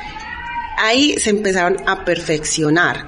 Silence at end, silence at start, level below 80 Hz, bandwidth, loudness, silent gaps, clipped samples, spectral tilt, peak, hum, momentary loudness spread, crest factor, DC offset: 0 s; 0 s; -40 dBFS; 11 kHz; -16 LUFS; none; under 0.1%; -3 dB/octave; -2 dBFS; none; 12 LU; 16 dB; under 0.1%